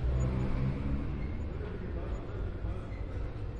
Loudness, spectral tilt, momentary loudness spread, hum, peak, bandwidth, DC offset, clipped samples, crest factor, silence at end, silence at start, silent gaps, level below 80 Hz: -37 LUFS; -8.5 dB/octave; 7 LU; none; -20 dBFS; 7.4 kHz; under 0.1%; under 0.1%; 14 dB; 0 s; 0 s; none; -36 dBFS